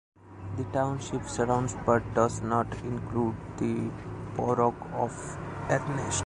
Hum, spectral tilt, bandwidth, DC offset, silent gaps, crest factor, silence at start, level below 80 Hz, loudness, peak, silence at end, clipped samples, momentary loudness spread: none; -6 dB/octave; 11 kHz; under 0.1%; none; 20 dB; 0.2 s; -48 dBFS; -30 LUFS; -8 dBFS; 0 s; under 0.1%; 10 LU